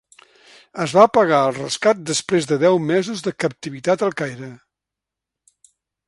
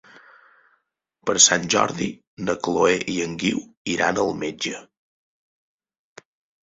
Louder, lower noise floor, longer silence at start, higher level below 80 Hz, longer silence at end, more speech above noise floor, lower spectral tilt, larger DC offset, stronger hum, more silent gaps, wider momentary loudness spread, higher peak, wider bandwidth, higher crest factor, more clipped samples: first, -18 LUFS vs -21 LUFS; first, -85 dBFS vs -70 dBFS; second, 0.75 s vs 1.25 s; second, -64 dBFS vs -58 dBFS; second, 1.5 s vs 1.85 s; first, 67 dB vs 49 dB; first, -4.5 dB/octave vs -2 dB/octave; neither; neither; second, none vs 2.27-2.37 s, 3.77-3.85 s; about the same, 14 LU vs 15 LU; about the same, 0 dBFS vs 0 dBFS; first, 11.5 kHz vs 8.4 kHz; about the same, 20 dB vs 24 dB; neither